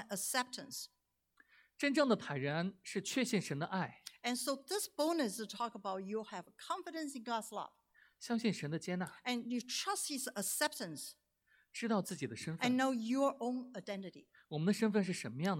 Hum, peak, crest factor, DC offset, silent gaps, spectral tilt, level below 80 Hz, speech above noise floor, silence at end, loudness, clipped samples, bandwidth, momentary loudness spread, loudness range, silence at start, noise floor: none; -20 dBFS; 20 dB; under 0.1%; none; -4 dB/octave; -84 dBFS; 36 dB; 0 s; -38 LUFS; under 0.1%; 17.5 kHz; 12 LU; 4 LU; 0 s; -75 dBFS